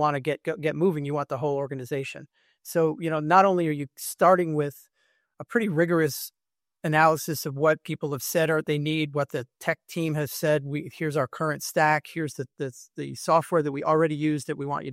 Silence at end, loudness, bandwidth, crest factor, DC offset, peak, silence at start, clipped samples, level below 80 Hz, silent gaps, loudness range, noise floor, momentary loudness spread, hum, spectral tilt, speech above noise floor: 0 s; -26 LUFS; 16 kHz; 20 dB; under 0.1%; -6 dBFS; 0 s; under 0.1%; -70 dBFS; none; 3 LU; -70 dBFS; 13 LU; none; -5.5 dB/octave; 45 dB